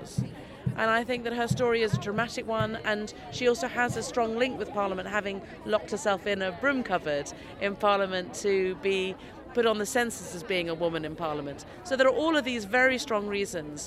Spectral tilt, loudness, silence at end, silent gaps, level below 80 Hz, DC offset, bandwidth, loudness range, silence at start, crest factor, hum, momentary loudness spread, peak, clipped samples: -4.5 dB/octave; -28 LUFS; 0 s; none; -56 dBFS; under 0.1%; 15.5 kHz; 2 LU; 0 s; 20 dB; none; 10 LU; -10 dBFS; under 0.1%